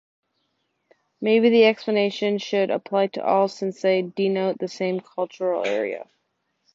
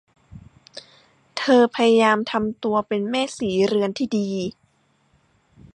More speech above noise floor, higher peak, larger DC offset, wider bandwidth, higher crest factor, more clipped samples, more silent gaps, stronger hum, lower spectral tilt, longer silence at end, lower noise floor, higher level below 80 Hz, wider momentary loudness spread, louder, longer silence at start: first, 52 dB vs 43 dB; about the same, -6 dBFS vs -4 dBFS; neither; second, 7.8 kHz vs 11 kHz; about the same, 18 dB vs 18 dB; neither; neither; neither; about the same, -6 dB/octave vs -5 dB/octave; second, 0.7 s vs 1.25 s; first, -74 dBFS vs -63 dBFS; second, -74 dBFS vs -58 dBFS; second, 10 LU vs 19 LU; about the same, -22 LUFS vs -21 LUFS; first, 1.2 s vs 0.35 s